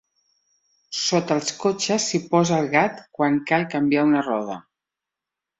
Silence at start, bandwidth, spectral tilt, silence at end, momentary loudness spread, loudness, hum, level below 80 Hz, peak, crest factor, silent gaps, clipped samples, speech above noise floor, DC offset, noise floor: 0.9 s; 8.2 kHz; -4.5 dB/octave; 1 s; 7 LU; -21 LUFS; none; -64 dBFS; -4 dBFS; 20 dB; none; under 0.1%; 65 dB; under 0.1%; -87 dBFS